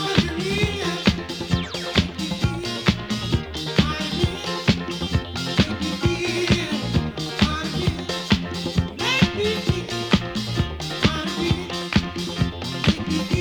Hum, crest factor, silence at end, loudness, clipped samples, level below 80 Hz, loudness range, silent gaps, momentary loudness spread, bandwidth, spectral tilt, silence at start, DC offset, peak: none; 22 dB; 0 s; -23 LUFS; under 0.1%; -36 dBFS; 1 LU; none; 4 LU; 20 kHz; -5 dB/octave; 0 s; under 0.1%; -2 dBFS